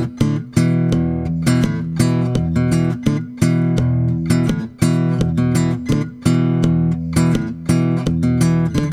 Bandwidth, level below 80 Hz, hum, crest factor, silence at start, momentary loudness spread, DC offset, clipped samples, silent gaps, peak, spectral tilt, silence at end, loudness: 14.5 kHz; -36 dBFS; none; 16 dB; 0 s; 3 LU; under 0.1%; under 0.1%; none; 0 dBFS; -7 dB/octave; 0 s; -17 LUFS